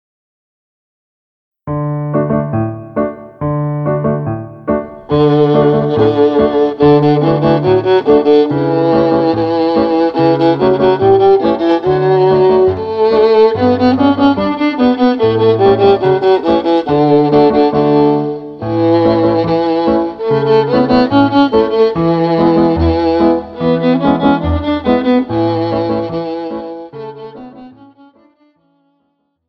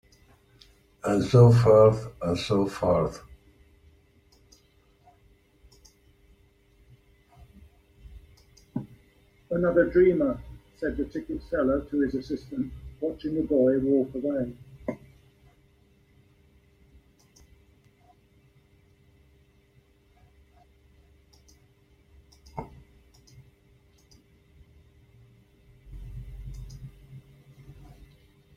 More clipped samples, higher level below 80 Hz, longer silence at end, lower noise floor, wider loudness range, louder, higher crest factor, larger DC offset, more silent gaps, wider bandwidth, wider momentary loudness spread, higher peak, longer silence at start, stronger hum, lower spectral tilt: neither; first, -36 dBFS vs -50 dBFS; first, 1.8 s vs 0.85 s; about the same, -64 dBFS vs -62 dBFS; second, 7 LU vs 27 LU; first, -12 LUFS vs -25 LUFS; second, 12 dB vs 24 dB; neither; neither; second, 6 kHz vs 11 kHz; second, 10 LU vs 25 LU; first, 0 dBFS vs -6 dBFS; first, 1.65 s vs 1.05 s; neither; first, -9.5 dB/octave vs -8 dB/octave